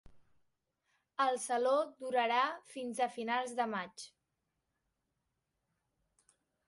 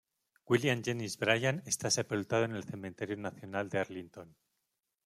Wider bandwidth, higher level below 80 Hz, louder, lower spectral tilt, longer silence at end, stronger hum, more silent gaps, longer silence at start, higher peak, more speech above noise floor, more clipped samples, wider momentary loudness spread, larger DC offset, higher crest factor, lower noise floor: second, 11.5 kHz vs 15.5 kHz; about the same, -78 dBFS vs -74 dBFS; about the same, -35 LUFS vs -34 LUFS; second, -2.5 dB/octave vs -4 dB/octave; first, 2.6 s vs 0.75 s; neither; neither; second, 0.1 s vs 0.5 s; second, -18 dBFS vs -12 dBFS; about the same, 51 dB vs 51 dB; neither; about the same, 14 LU vs 12 LU; neither; about the same, 20 dB vs 24 dB; about the same, -85 dBFS vs -85 dBFS